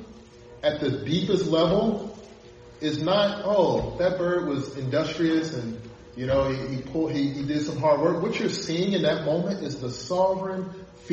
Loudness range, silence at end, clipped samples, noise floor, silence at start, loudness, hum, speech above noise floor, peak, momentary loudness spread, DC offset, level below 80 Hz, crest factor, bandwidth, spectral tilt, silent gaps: 2 LU; 0 s; under 0.1%; -47 dBFS; 0 s; -25 LUFS; none; 22 dB; -8 dBFS; 11 LU; under 0.1%; -50 dBFS; 18 dB; 8.4 kHz; -6 dB/octave; none